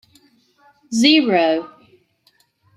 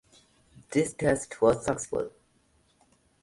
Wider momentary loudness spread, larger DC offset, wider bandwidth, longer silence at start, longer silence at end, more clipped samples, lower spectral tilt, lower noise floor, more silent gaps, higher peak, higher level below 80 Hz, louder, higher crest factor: about the same, 11 LU vs 9 LU; neither; about the same, 12.5 kHz vs 11.5 kHz; first, 0.9 s vs 0.7 s; about the same, 1.1 s vs 1.15 s; neither; second, -3.5 dB/octave vs -5.5 dB/octave; second, -61 dBFS vs -67 dBFS; neither; first, -2 dBFS vs -8 dBFS; second, -68 dBFS vs -56 dBFS; first, -16 LUFS vs -28 LUFS; about the same, 18 dB vs 22 dB